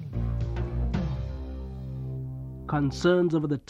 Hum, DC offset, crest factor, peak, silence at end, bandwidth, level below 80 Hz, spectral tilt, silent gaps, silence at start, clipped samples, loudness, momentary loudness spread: none; under 0.1%; 16 dB; -12 dBFS; 0.1 s; 8.2 kHz; -36 dBFS; -7.5 dB/octave; none; 0 s; under 0.1%; -29 LUFS; 14 LU